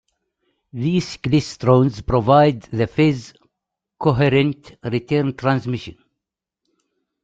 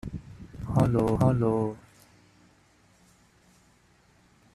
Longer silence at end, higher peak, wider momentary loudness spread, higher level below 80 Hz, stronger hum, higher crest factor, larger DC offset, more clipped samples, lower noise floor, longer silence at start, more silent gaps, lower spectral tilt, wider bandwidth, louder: second, 1.3 s vs 2.8 s; first, -2 dBFS vs -8 dBFS; second, 13 LU vs 20 LU; about the same, -44 dBFS vs -48 dBFS; neither; about the same, 18 dB vs 22 dB; neither; neither; first, -84 dBFS vs -62 dBFS; first, 0.75 s vs 0.05 s; neither; second, -7.5 dB/octave vs -9 dB/octave; second, 8 kHz vs 13 kHz; first, -19 LUFS vs -26 LUFS